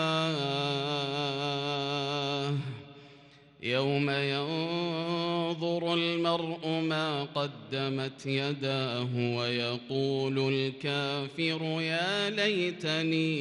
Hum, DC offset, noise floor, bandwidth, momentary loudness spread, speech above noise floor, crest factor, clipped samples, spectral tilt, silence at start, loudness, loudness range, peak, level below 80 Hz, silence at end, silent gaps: none; under 0.1%; -56 dBFS; 11.5 kHz; 5 LU; 25 dB; 16 dB; under 0.1%; -5.5 dB/octave; 0 s; -30 LUFS; 2 LU; -14 dBFS; -76 dBFS; 0 s; none